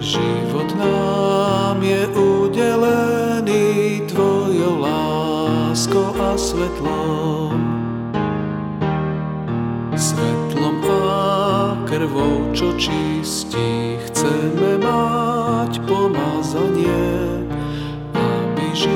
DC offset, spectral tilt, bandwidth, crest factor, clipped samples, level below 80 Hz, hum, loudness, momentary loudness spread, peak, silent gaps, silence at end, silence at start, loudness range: under 0.1%; -5.5 dB/octave; 17 kHz; 14 dB; under 0.1%; -40 dBFS; none; -19 LUFS; 6 LU; -4 dBFS; none; 0 s; 0 s; 4 LU